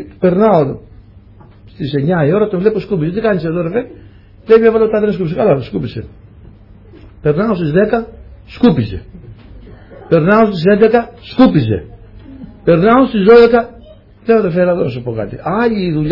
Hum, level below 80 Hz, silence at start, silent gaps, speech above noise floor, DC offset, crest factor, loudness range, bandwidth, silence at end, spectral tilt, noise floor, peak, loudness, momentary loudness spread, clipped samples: none; -40 dBFS; 0 s; none; 28 dB; under 0.1%; 14 dB; 5 LU; 5.8 kHz; 0 s; -10 dB/octave; -40 dBFS; 0 dBFS; -13 LUFS; 13 LU; under 0.1%